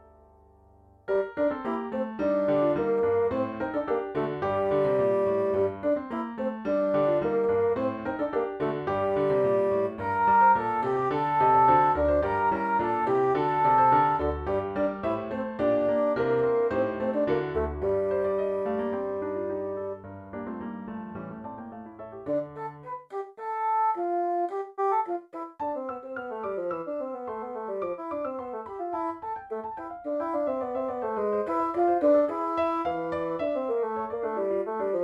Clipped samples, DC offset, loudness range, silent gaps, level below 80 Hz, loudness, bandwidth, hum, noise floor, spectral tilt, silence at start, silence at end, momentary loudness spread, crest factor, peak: under 0.1%; under 0.1%; 10 LU; none; -52 dBFS; -27 LUFS; 6 kHz; none; -57 dBFS; -8.5 dB/octave; 1.05 s; 0 s; 13 LU; 16 dB; -10 dBFS